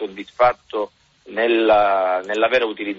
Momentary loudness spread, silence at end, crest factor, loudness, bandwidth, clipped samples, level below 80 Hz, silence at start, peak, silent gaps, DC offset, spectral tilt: 14 LU; 0 s; 16 dB; -18 LUFS; 7.6 kHz; under 0.1%; -56 dBFS; 0 s; -4 dBFS; none; under 0.1%; -1.5 dB/octave